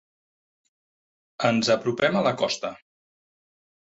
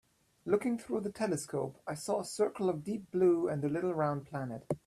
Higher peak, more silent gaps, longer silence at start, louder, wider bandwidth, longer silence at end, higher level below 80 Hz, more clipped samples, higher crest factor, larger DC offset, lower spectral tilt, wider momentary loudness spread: first, -8 dBFS vs -16 dBFS; neither; first, 1.4 s vs 0.45 s; first, -24 LUFS vs -34 LUFS; second, 8 kHz vs 13 kHz; first, 1.1 s vs 0.1 s; about the same, -66 dBFS vs -70 dBFS; neither; about the same, 20 dB vs 18 dB; neither; second, -4.5 dB/octave vs -6.5 dB/octave; second, 7 LU vs 10 LU